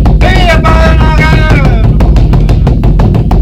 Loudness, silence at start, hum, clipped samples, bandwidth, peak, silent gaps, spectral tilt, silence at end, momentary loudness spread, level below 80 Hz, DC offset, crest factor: -7 LUFS; 0 s; none; 6%; 8.8 kHz; 0 dBFS; none; -7 dB/octave; 0 s; 2 LU; -8 dBFS; under 0.1%; 4 dB